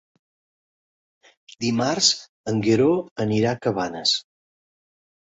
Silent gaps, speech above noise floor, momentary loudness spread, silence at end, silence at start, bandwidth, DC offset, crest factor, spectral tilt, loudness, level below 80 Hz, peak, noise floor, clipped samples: 2.29-2.44 s, 3.11-3.16 s; over 68 dB; 7 LU; 1 s; 1.6 s; 8 kHz; under 0.1%; 20 dB; -4 dB/octave; -22 LUFS; -62 dBFS; -4 dBFS; under -90 dBFS; under 0.1%